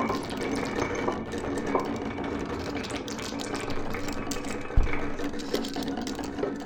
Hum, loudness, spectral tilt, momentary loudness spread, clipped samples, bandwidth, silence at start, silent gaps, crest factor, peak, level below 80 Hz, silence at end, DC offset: none; -32 LUFS; -5 dB/octave; 4 LU; under 0.1%; 17.5 kHz; 0 s; none; 22 dB; -8 dBFS; -36 dBFS; 0 s; under 0.1%